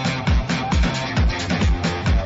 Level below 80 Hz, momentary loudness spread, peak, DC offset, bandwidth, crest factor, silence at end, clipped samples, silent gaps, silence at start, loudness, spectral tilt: -22 dBFS; 1 LU; -8 dBFS; under 0.1%; 8 kHz; 10 dB; 0 s; under 0.1%; none; 0 s; -21 LUFS; -5.5 dB/octave